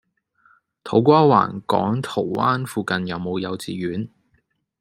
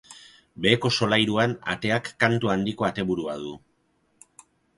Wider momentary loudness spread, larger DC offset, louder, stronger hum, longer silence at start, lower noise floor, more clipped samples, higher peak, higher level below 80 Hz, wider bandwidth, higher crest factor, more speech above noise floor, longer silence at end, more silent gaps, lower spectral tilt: first, 13 LU vs 8 LU; neither; first, -20 LUFS vs -24 LUFS; neither; first, 0.85 s vs 0.1 s; about the same, -67 dBFS vs -68 dBFS; neither; about the same, -2 dBFS vs -2 dBFS; second, -62 dBFS vs -56 dBFS; first, 15.5 kHz vs 11.5 kHz; about the same, 20 dB vs 24 dB; about the same, 47 dB vs 44 dB; second, 0.75 s vs 1.2 s; neither; first, -7 dB/octave vs -5 dB/octave